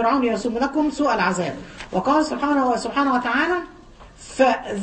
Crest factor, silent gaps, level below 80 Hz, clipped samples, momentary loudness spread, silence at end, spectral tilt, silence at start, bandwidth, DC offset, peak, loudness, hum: 16 dB; none; -48 dBFS; under 0.1%; 8 LU; 0 s; -5 dB/octave; 0 s; 8.8 kHz; under 0.1%; -4 dBFS; -21 LUFS; none